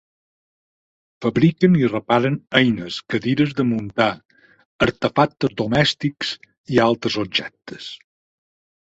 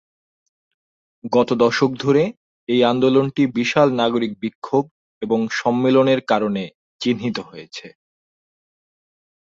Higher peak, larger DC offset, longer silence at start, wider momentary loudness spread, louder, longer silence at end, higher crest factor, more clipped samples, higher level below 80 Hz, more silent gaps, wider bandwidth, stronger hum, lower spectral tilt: about the same, -2 dBFS vs -2 dBFS; neither; about the same, 1.2 s vs 1.25 s; about the same, 17 LU vs 18 LU; about the same, -20 LUFS vs -19 LUFS; second, 0.9 s vs 1.65 s; about the same, 18 dB vs 18 dB; neither; first, -52 dBFS vs -62 dBFS; second, 4.25-4.29 s, 4.65-4.79 s, 6.58-6.64 s vs 2.37-2.67 s, 4.55-4.62 s, 4.91-5.21 s, 6.75-6.99 s; about the same, 8 kHz vs 7.6 kHz; neither; about the same, -6.5 dB/octave vs -6 dB/octave